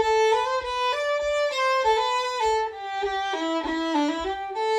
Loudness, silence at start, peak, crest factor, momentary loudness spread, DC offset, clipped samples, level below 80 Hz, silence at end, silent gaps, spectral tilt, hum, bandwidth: -24 LUFS; 0 s; -10 dBFS; 14 dB; 7 LU; under 0.1%; under 0.1%; -52 dBFS; 0 s; none; -2.5 dB/octave; none; 13 kHz